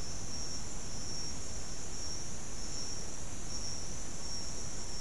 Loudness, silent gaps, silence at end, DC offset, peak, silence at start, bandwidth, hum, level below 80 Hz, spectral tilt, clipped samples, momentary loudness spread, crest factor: -41 LUFS; none; 0 s; 2%; -24 dBFS; 0 s; 12 kHz; none; -50 dBFS; -2.5 dB/octave; under 0.1%; 3 LU; 12 dB